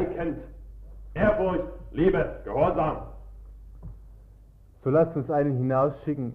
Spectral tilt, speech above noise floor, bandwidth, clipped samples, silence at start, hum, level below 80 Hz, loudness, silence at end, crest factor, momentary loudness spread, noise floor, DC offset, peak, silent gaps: -10 dB/octave; 27 dB; 5.2 kHz; under 0.1%; 0 s; none; -42 dBFS; -26 LUFS; 0 s; 18 dB; 23 LU; -52 dBFS; under 0.1%; -10 dBFS; none